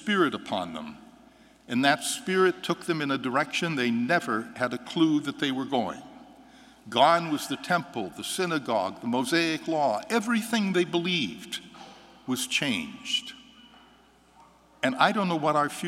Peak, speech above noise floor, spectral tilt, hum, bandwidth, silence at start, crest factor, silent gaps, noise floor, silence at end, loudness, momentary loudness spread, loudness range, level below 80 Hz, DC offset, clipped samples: -6 dBFS; 31 dB; -4 dB/octave; none; 16 kHz; 0 s; 22 dB; none; -58 dBFS; 0 s; -27 LUFS; 10 LU; 3 LU; -70 dBFS; under 0.1%; under 0.1%